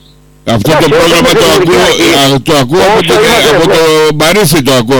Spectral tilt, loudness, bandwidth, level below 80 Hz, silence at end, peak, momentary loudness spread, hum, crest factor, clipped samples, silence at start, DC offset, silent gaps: -4 dB/octave; -6 LUFS; 19.5 kHz; -32 dBFS; 0 s; -2 dBFS; 3 LU; none; 6 dB; under 0.1%; 0.45 s; under 0.1%; none